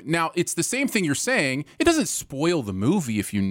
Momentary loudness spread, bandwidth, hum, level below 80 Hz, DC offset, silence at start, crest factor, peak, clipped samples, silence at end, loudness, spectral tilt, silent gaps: 4 LU; 17 kHz; none; -54 dBFS; under 0.1%; 0 s; 18 dB; -6 dBFS; under 0.1%; 0 s; -23 LUFS; -4 dB/octave; none